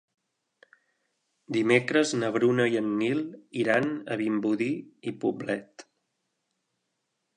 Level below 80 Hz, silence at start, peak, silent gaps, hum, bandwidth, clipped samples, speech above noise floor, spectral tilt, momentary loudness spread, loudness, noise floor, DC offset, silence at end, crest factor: -76 dBFS; 1.5 s; -6 dBFS; none; none; 10 kHz; under 0.1%; 53 dB; -5.5 dB/octave; 10 LU; -27 LUFS; -80 dBFS; under 0.1%; 1.55 s; 22 dB